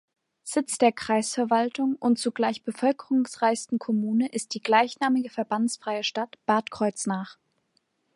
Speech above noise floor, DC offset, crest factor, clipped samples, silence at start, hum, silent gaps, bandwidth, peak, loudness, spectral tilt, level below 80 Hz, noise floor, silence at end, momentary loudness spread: 47 dB; under 0.1%; 20 dB; under 0.1%; 0.45 s; none; none; 11.5 kHz; -6 dBFS; -26 LUFS; -4 dB/octave; -72 dBFS; -72 dBFS; 0.85 s; 7 LU